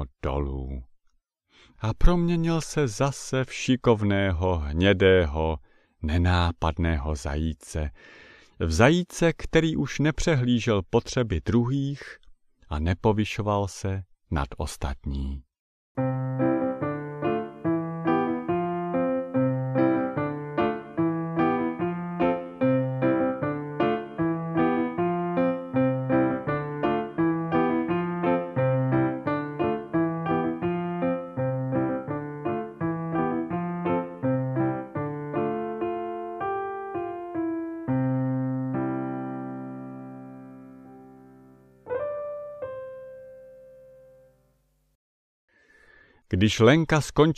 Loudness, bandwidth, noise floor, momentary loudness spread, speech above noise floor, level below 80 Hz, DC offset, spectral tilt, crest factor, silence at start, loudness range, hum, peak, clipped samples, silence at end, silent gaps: -26 LUFS; 13 kHz; -68 dBFS; 11 LU; 44 dB; -38 dBFS; under 0.1%; -6.5 dB/octave; 22 dB; 0 s; 10 LU; none; -4 dBFS; under 0.1%; 0.05 s; 15.59-15.95 s, 44.95-45.48 s